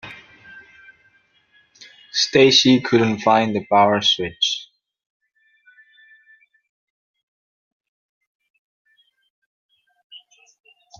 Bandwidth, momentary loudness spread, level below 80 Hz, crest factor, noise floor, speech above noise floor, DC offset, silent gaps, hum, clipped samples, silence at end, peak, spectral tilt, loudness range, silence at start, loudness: 7.4 kHz; 10 LU; -62 dBFS; 22 dB; -59 dBFS; 43 dB; under 0.1%; 5.06-5.20 s, 6.69-7.14 s, 7.23-7.80 s, 7.88-8.21 s, 8.27-8.40 s, 8.50-8.85 s, 9.30-9.69 s, 10.04-10.10 s; none; under 0.1%; 0.85 s; -2 dBFS; -4 dB/octave; 10 LU; 0.05 s; -16 LUFS